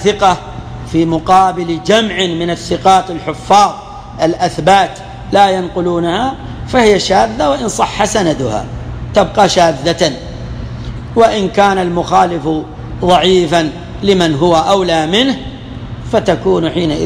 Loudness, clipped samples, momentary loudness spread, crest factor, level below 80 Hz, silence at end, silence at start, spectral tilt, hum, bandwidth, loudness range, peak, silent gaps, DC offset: -12 LUFS; under 0.1%; 15 LU; 12 dB; -32 dBFS; 0 s; 0 s; -5 dB/octave; none; 14 kHz; 2 LU; 0 dBFS; none; under 0.1%